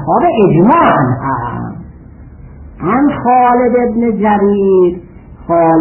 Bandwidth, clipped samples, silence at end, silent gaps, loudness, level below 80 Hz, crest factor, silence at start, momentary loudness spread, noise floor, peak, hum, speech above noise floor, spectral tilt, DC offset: 3.2 kHz; under 0.1%; 0 s; none; -11 LUFS; -38 dBFS; 12 dB; 0 s; 14 LU; -34 dBFS; 0 dBFS; none; 24 dB; -12 dB/octave; under 0.1%